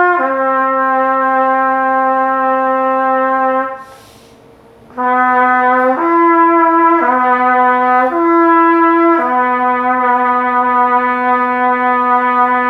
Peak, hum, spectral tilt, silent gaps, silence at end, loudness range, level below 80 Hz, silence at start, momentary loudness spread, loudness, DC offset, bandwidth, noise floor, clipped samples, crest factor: 0 dBFS; none; -6 dB/octave; none; 0 s; 4 LU; -58 dBFS; 0 s; 4 LU; -12 LUFS; under 0.1%; 5.6 kHz; -42 dBFS; under 0.1%; 12 dB